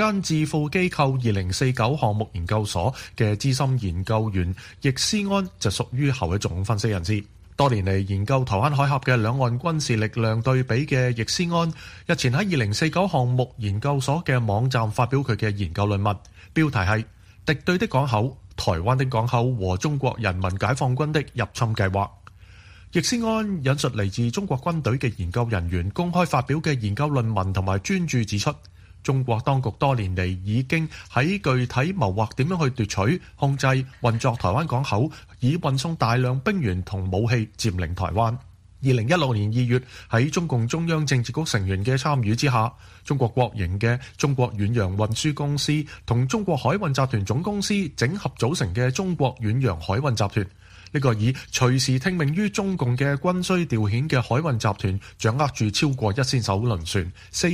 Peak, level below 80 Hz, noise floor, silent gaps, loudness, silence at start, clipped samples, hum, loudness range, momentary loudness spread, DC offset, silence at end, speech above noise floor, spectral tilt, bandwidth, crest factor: -6 dBFS; -46 dBFS; -47 dBFS; none; -23 LUFS; 0 s; under 0.1%; none; 2 LU; 5 LU; under 0.1%; 0 s; 24 dB; -5.5 dB/octave; 15 kHz; 18 dB